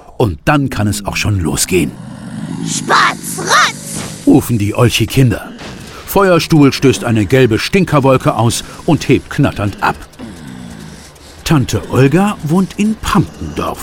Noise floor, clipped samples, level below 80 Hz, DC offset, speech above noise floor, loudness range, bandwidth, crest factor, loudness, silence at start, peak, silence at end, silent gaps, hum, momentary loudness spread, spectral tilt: -35 dBFS; under 0.1%; -34 dBFS; under 0.1%; 23 dB; 4 LU; 17.5 kHz; 14 dB; -13 LUFS; 0.1 s; 0 dBFS; 0 s; none; none; 18 LU; -5 dB/octave